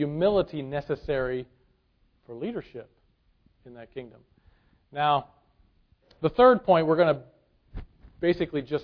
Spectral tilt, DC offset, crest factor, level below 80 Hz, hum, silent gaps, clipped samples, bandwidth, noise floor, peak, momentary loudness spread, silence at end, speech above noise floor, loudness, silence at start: -9 dB/octave; under 0.1%; 22 dB; -52 dBFS; none; none; under 0.1%; 5.4 kHz; -67 dBFS; -6 dBFS; 26 LU; 0 s; 42 dB; -25 LUFS; 0 s